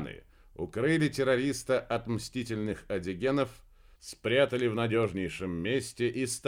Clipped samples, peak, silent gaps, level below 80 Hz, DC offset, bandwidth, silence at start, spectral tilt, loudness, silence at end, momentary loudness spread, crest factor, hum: under 0.1%; -14 dBFS; none; -56 dBFS; under 0.1%; 16.5 kHz; 0 s; -5 dB/octave; -30 LUFS; 0 s; 10 LU; 18 dB; none